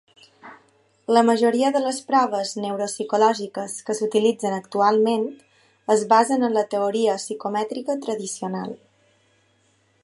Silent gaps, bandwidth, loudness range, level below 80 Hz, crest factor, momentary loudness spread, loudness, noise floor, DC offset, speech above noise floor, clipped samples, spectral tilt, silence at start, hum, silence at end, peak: none; 11.5 kHz; 4 LU; -76 dBFS; 18 dB; 12 LU; -22 LUFS; -63 dBFS; under 0.1%; 42 dB; under 0.1%; -4 dB/octave; 0.45 s; none; 1.25 s; -4 dBFS